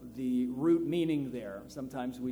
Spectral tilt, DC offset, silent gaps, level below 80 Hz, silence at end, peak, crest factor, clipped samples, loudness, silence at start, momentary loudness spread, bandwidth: -7.5 dB/octave; under 0.1%; none; -62 dBFS; 0 s; -18 dBFS; 14 dB; under 0.1%; -33 LUFS; 0 s; 13 LU; 15 kHz